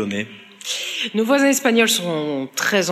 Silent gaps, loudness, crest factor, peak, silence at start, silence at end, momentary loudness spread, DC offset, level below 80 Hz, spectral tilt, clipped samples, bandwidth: none; -19 LUFS; 16 dB; -2 dBFS; 0 s; 0 s; 11 LU; under 0.1%; -78 dBFS; -3 dB/octave; under 0.1%; 15 kHz